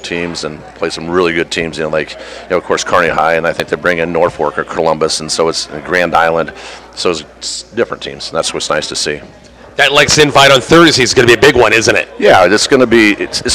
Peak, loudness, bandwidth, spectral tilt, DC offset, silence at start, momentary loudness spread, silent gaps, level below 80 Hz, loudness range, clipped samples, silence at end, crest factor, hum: 0 dBFS; -11 LUFS; 16 kHz; -3.5 dB/octave; under 0.1%; 0 s; 14 LU; none; -40 dBFS; 8 LU; 0.5%; 0 s; 12 dB; none